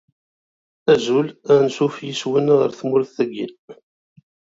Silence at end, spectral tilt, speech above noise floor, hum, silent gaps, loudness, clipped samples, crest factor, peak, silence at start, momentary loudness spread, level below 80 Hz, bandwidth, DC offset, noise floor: 0.85 s; -6 dB/octave; over 72 dB; none; 3.59-3.68 s; -19 LUFS; under 0.1%; 18 dB; -2 dBFS; 0.85 s; 9 LU; -64 dBFS; 7.8 kHz; under 0.1%; under -90 dBFS